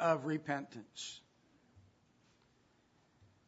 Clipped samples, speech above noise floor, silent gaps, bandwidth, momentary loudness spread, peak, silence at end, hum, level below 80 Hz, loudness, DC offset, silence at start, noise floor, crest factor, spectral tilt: under 0.1%; 34 dB; none; 7.6 kHz; 15 LU; -18 dBFS; 1.7 s; none; -82 dBFS; -40 LUFS; under 0.1%; 0 s; -72 dBFS; 24 dB; -4 dB/octave